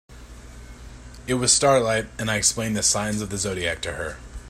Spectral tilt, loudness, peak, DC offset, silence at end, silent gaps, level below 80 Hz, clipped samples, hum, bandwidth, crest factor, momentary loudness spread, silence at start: -2.5 dB/octave; -22 LUFS; -4 dBFS; under 0.1%; 0 s; none; -44 dBFS; under 0.1%; 60 Hz at -50 dBFS; 16 kHz; 20 dB; 15 LU; 0.1 s